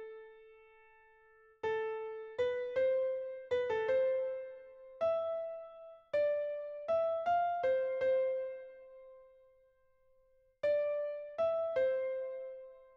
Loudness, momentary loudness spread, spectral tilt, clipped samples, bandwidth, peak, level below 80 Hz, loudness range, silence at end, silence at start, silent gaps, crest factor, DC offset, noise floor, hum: -35 LUFS; 19 LU; -5 dB/octave; under 0.1%; 6.6 kHz; -24 dBFS; -76 dBFS; 4 LU; 0.1 s; 0 s; none; 14 dB; under 0.1%; -70 dBFS; none